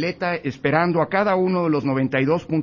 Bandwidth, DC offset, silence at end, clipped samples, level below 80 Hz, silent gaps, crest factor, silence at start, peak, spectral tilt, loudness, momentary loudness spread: 7.2 kHz; under 0.1%; 0 s; under 0.1%; -56 dBFS; none; 16 dB; 0 s; -4 dBFS; -8 dB/octave; -21 LUFS; 5 LU